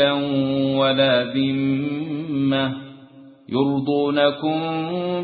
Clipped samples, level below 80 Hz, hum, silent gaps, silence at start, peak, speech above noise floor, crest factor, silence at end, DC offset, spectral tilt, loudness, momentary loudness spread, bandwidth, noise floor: under 0.1%; -60 dBFS; none; none; 0 s; -6 dBFS; 25 dB; 16 dB; 0 s; under 0.1%; -11 dB/octave; -21 LUFS; 8 LU; 4.8 kHz; -45 dBFS